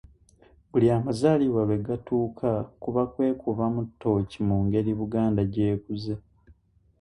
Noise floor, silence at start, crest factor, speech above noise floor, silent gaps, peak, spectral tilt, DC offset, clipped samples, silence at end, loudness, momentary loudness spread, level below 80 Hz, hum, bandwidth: -59 dBFS; 0.75 s; 18 dB; 34 dB; none; -8 dBFS; -9 dB/octave; under 0.1%; under 0.1%; 0.8 s; -26 LUFS; 7 LU; -50 dBFS; none; 11 kHz